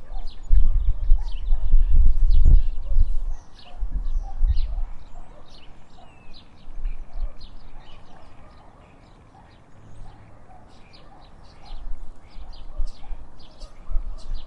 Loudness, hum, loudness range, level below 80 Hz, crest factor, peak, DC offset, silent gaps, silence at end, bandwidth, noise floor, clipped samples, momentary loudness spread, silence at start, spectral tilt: -28 LUFS; none; 24 LU; -22 dBFS; 16 dB; -2 dBFS; under 0.1%; none; 0 s; 4.7 kHz; -48 dBFS; under 0.1%; 27 LU; 0 s; -7.5 dB/octave